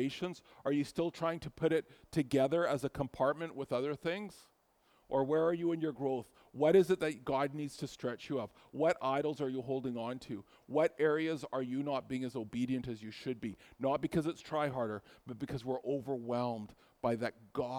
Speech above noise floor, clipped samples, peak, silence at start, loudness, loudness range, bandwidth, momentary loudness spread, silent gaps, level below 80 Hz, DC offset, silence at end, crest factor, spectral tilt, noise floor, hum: 36 dB; under 0.1%; -16 dBFS; 0 s; -36 LUFS; 4 LU; 19 kHz; 11 LU; none; -68 dBFS; under 0.1%; 0 s; 20 dB; -6.5 dB/octave; -72 dBFS; none